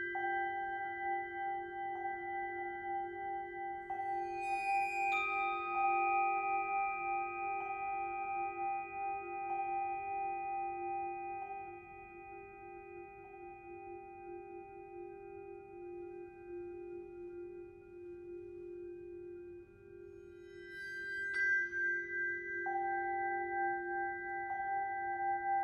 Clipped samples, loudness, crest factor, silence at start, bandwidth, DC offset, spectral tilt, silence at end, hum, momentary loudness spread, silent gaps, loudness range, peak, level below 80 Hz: under 0.1%; -38 LUFS; 16 dB; 0 s; 10.5 kHz; under 0.1%; -5 dB/octave; 0 s; none; 17 LU; none; 15 LU; -24 dBFS; -70 dBFS